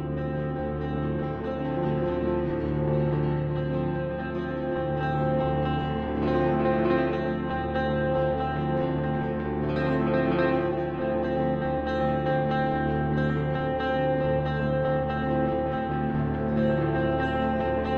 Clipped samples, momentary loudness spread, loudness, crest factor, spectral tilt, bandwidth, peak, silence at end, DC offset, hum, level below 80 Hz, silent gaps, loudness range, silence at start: under 0.1%; 5 LU; -27 LUFS; 16 dB; -9.5 dB/octave; 5.2 kHz; -10 dBFS; 0 s; under 0.1%; none; -40 dBFS; none; 2 LU; 0 s